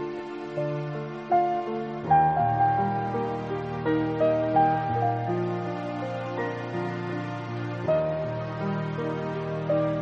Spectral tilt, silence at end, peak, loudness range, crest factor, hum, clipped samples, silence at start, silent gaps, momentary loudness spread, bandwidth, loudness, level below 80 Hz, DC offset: -8.5 dB/octave; 0 s; -10 dBFS; 5 LU; 16 dB; none; under 0.1%; 0 s; none; 9 LU; 7.8 kHz; -27 LUFS; -56 dBFS; under 0.1%